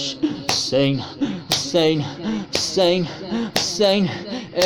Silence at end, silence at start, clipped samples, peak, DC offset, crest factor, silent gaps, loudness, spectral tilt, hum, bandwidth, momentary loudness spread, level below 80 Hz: 0 s; 0 s; under 0.1%; -4 dBFS; under 0.1%; 18 dB; none; -20 LUFS; -4 dB/octave; none; 19 kHz; 9 LU; -52 dBFS